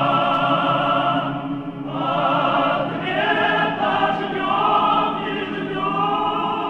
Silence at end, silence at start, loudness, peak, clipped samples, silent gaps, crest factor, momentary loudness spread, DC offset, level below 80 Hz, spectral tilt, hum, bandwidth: 0 s; 0 s; -20 LUFS; -6 dBFS; under 0.1%; none; 14 dB; 7 LU; under 0.1%; -52 dBFS; -7 dB/octave; none; 9.2 kHz